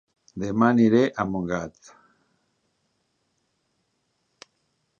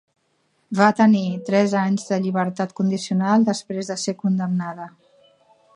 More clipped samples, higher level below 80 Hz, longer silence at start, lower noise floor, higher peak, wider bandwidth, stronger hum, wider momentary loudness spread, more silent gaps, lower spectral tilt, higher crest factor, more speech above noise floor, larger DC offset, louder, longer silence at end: neither; first, -58 dBFS vs -70 dBFS; second, 0.35 s vs 0.7 s; first, -73 dBFS vs -67 dBFS; about the same, -4 dBFS vs -2 dBFS; second, 7.2 kHz vs 10.5 kHz; neither; first, 17 LU vs 10 LU; neither; first, -7.5 dB/octave vs -6 dB/octave; about the same, 22 dB vs 20 dB; first, 51 dB vs 47 dB; neither; about the same, -22 LUFS vs -21 LUFS; first, 3.3 s vs 0.85 s